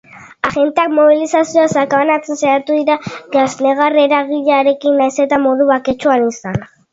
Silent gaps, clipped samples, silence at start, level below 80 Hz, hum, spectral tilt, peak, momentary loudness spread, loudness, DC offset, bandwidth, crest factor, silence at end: none; under 0.1%; 0.15 s; -52 dBFS; none; -5 dB/octave; 0 dBFS; 7 LU; -13 LUFS; under 0.1%; 7.8 kHz; 14 dB; 0.25 s